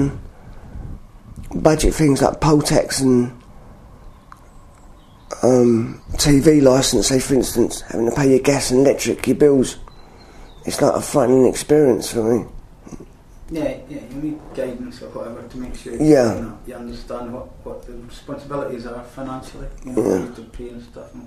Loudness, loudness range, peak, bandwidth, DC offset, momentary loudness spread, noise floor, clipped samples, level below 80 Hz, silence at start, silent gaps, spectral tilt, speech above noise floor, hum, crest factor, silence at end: -17 LUFS; 11 LU; 0 dBFS; 14 kHz; under 0.1%; 21 LU; -44 dBFS; under 0.1%; -34 dBFS; 0 s; none; -5 dB/octave; 26 dB; none; 18 dB; 0 s